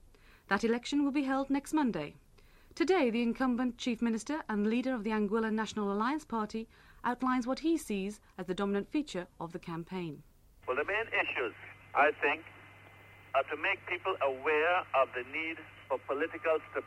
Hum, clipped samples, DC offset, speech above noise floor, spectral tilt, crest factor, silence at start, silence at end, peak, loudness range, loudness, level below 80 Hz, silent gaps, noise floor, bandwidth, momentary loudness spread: none; under 0.1%; under 0.1%; 26 dB; -5 dB/octave; 20 dB; 0.5 s; 0 s; -14 dBFS; 4 LU; -33 LUFS; -62 dBFS; none; -59 dBFS; 13.5 kHz; 12 LU